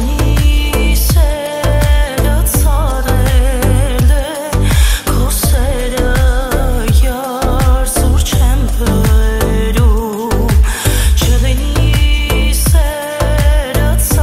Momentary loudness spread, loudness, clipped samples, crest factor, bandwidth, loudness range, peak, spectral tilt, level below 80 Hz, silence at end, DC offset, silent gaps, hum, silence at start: 4 LU; -13 LUFS; under 0.1%; 10 dB; 16.5 kHz; 1 LU; 0 dBFS; -5 dB/octave; -12 dBFS; 0 s; under 0.1%; none; none; 0 s